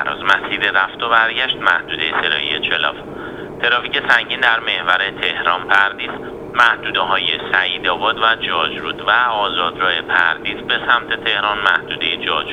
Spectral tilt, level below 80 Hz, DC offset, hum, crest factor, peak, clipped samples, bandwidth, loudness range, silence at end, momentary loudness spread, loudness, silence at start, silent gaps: -3.5 dB/octave; -50 dBFS; under 0.1%; none; 18 dB; 0 dBFS; under 0.1%; 12 kHz; 1 LU; 0 s; 6 LU; -16 LUFS; 0 s; none